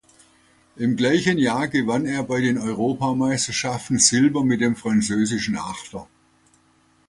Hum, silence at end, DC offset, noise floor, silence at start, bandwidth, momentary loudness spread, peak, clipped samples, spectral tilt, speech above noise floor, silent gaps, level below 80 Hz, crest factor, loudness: none; 1.05 s; under 0.1%; -60 dBFS; 0.75 s; 11.5 kHz; 10 LU; -2 dBFS; under 0.1%; -4 dB/octave; 39 dB; none; -54 dBFS; 20 dB; -21 LUFS